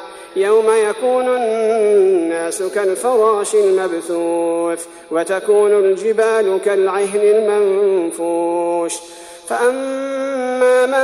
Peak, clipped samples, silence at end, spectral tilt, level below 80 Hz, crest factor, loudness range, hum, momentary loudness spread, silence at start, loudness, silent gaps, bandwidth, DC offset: -2 dBFS; under 0.1%; 0 s; -3.5 dB/octave; -64 dBFS; 12 dB; 2 LU; none; 9 LU; 0 s; -16 LUFS; none; 13.5 kHz; under 0.1%